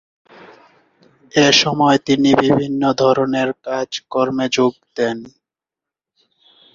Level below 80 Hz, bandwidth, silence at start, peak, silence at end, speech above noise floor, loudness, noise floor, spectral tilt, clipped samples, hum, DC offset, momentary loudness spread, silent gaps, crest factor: -56 dBFS; 7.6 kHz; 1.35 s; 0 dBFS; 1.45 s; 71 dB; -16 LUFS; -87 dBFS; -4.5 dB/octave; under 0.1%; none; under 0.1%; 10 LU; none; 18 dB